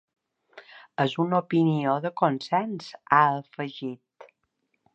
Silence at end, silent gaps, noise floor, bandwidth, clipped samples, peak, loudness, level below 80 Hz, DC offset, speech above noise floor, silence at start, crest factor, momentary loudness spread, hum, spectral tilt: 0.7 s; none; -76 dBFS; 8.4 kHz; under 0.1%; -4 dBFS; -25 LUFS; -78 dBFS; under 0.1%; 51 dB; 0.55 s; 22 dB; 16 LU; none; -7.5 dB/octave